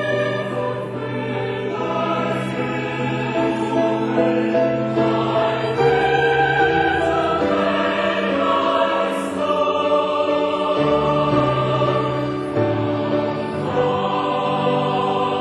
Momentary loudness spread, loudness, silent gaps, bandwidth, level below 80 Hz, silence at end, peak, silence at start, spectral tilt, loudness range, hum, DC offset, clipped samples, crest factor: 6 LU; -19 LUFS; none; 12 kHz; -48 dBFS; 0 s; -4 dBFS; 0 s; -6.5 dB/octave; 4 LU; none; under 0.1%; under 0.1%; 16 dB